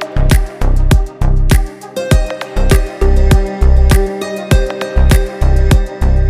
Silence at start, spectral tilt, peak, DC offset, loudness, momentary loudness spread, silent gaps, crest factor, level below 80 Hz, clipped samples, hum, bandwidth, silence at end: 0 s; -6 dB/octave; 0 dBFS; under 0.1%; -14 LUFS; 6 LU; none; 10 dB; -12 dBFS; under 0.1%; none; 15 kHz; 0 s